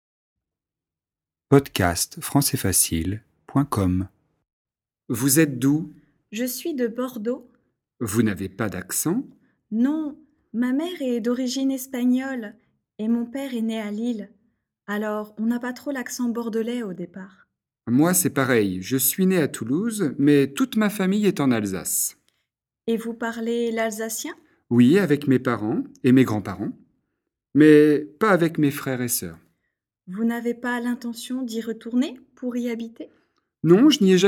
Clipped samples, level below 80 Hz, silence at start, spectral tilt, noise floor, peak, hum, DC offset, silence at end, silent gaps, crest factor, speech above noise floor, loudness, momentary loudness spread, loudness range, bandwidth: under 0.1%; -56 dBFS; 1.5 s; -5 dB/octave; under -90 dBFS; 0 dBFS; none; under 0.1%; 0 s; 4.53-4.65 s; 22 dB; over 68 dB; -22 LUFS; 13 LU; 8 LU; 18.5 kHz